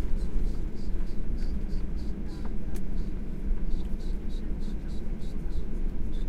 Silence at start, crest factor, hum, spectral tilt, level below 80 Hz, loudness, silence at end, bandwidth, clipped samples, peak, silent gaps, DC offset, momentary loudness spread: 0 s; 12 dB; none; -8 dB/octave; -30 dBFS; -37 LUFS; 0 s; 5.4 kHz; under 0.1%; -14 dBFS; none; under 0.1%; 3 LU